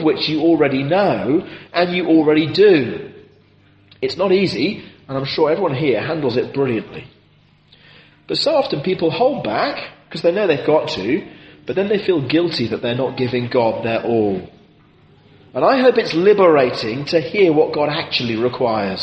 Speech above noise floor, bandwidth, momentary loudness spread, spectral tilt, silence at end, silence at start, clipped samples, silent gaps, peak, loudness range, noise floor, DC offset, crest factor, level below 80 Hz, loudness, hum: 36 dB; 8.4 kHz; 12 LU; -6.5 dB/octave; 0 s; 0 s; under 0.1%; none; -2 dBFS; 5 LU; -53 dBFS; under 0.1%; 16 dB; -56 dBFS; -17 LUFS; none